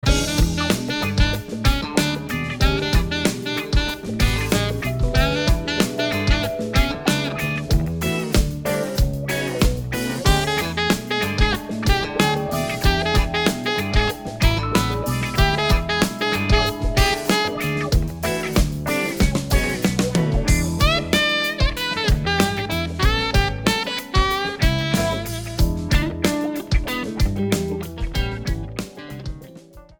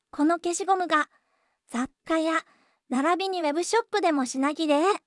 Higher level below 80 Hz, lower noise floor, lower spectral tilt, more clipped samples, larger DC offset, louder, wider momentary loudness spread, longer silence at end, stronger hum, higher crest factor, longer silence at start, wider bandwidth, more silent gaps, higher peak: first, -26 dBFS vs -70 dBFS; second, -43 dBFS vs -72 dBFS; first, -4.5 dB/octave vs -2 dB/octave; neither; neither; first, -21 LUFS vs -26 LUFS; second, 5 LU vs 9 LU; about the same, 0.2 s vs 0.1 s; neither; about the same, 16 dB vs 16 dB; about the same, 0.05 s vs 0.15 s; first, over 20 kHz vs 12 kHz; neither; first, -4 dBFS vs -10 dBFS